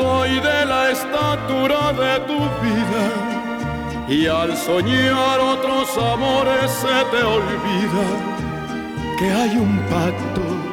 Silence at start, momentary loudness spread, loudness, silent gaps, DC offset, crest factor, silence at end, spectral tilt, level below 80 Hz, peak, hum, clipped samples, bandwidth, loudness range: 0 s; 8 LU; -19 LUFS; none; under 0.1%; 14 dB; 0 s; -5 dB/octave; -42 dBFS; -4 dBFS; none; under 0.1%; 19 kHz; 2 LU